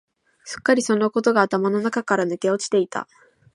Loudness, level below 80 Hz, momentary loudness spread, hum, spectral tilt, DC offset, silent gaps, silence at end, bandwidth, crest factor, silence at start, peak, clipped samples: -21 LUFS; -68 dBFS; 10 LU; none; -4.5 dB/octave; under 0.1%; none; 0.5 s; 11.5 kHz; 20 dB; 0.45 s; -2 dBFS; under 0.1%